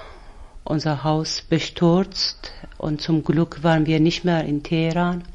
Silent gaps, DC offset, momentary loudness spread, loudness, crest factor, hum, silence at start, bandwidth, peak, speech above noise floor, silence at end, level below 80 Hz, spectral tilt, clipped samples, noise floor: none; under 0.1%; 9 LU; -21 LUFS; 16 dB; none; 0 s; 7.8 kHz; -6 dBFS; 20 dB; 0.05 s; -42 dBFS; -6 dB/octave; under 0.1%; -40 dBFS